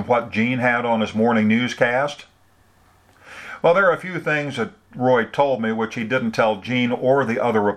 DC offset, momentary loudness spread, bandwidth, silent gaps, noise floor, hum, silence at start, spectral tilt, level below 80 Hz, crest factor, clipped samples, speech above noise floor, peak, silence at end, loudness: under 0.1%; 8 LU; 10.5 kHz; none; -57 dBFS; none; 0 s; -6 dB/octave; -62 dBFS; 20 dB; under 0.1%; 37 dB; -2 dBFS; 0 s; -20 LUFS